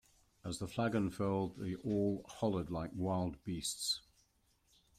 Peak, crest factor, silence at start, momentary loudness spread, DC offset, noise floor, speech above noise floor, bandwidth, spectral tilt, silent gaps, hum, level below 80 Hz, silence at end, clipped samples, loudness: -22 dBFS; 18 dB; 0.45 s; 6 LU; under 0.1%; -75 dBFS; 37 dB; 16 kHz; -5 dB/octave; none; none; -64 dBFS; 1 s; under 0.1%; -38 LUFS